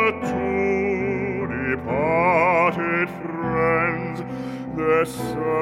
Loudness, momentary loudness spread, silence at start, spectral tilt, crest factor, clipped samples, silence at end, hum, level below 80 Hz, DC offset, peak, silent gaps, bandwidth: -22 LUFS; 10 LU; 0 s; -7 dB/octave; 14 dB; under 0.1%; 0 s; none; -50 dBFS; under 0.1%; -8 dBFS; none; 15.5 kHz